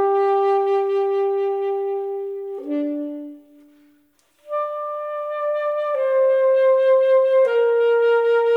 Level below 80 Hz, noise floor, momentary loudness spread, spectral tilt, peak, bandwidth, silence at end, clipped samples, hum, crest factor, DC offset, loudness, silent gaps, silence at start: -82 dBFS; -61 dBFS; 12 LU; -4 dB/octave; -8 dBFS; 5 kHz; 0 s; under 0.1%; none; 10 dB; under 0.1%; -20 LUFS; none; 0 s